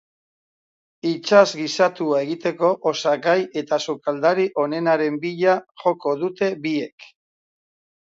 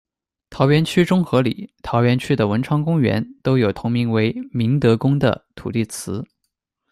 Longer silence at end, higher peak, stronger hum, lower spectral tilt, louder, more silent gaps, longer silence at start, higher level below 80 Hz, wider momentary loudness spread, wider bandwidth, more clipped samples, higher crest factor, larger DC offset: first, 0.95 s vs 0.7 s; about the same, -2 dBFS vs -2 dBFS; neither; second, -5 dB/octave vs -7 dB/octave; about the same, -21 LUFS vs -19 LUFS; first, 5.71-5.75 s, 6.92-6.98 s vs none; first, 1.05 s vs 0.5 s; second, -74 dBFS vs -50 dBFS; about the same, 9 LU vs 9 LU; second, 7.8 kHz vs 14 kHz; neither; about the same, 20 dB vs 16 dB; neither